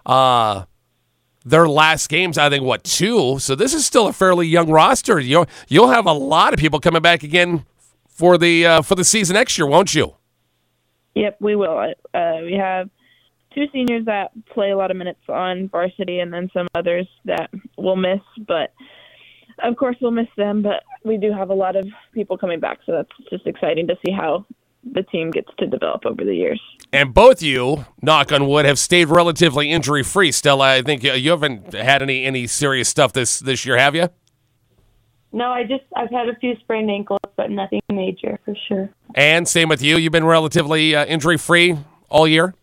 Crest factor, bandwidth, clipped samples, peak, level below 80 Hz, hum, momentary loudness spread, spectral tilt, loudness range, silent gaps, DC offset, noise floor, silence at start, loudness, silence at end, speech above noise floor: 18 dB; 16.5 kHz; under 0.1%; 0 dBFS; -44 dBFS; none; 12 LU; -3.5 dB/octave; 9 LU; none; under 0.1%; -67 dBFS; 0.05 s; -16 LUFS; 0.1 s; 50 dB